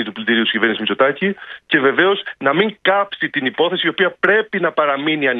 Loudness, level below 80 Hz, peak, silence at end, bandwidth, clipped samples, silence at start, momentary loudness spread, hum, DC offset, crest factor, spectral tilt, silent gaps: -16 LUFS; -66 dBFS; 0 dBFS; 0 s; 4.7 kHz; under 0.1%; 0 s; 5 LU; none; under 0.1%; 16 dB; -7.5 dB/octave; none